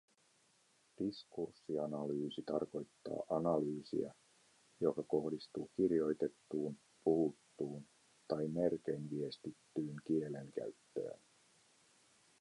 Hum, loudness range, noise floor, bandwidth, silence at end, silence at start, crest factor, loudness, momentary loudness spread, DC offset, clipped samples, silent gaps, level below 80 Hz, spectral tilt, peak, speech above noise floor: none; 5 LU; -74 dBFS; 11.5 kHz; 1.25 s; 1 s; 20 dB; -41 LUFS; 11 LU; under 0.1%; under 0.1%; none; -76 dBFS; -7.5 dB/octave; -20 dBFS; 34 dB